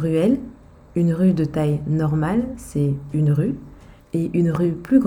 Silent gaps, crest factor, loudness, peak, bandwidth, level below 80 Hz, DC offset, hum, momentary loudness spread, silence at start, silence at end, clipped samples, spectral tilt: none; 16 dB; -21 LUFS; -4 dBFS; 14 kHz; -44 dBFS; under 0.1%; none; 9 LU; 0 s; 0 s; under 0.1%; -9 dB/octave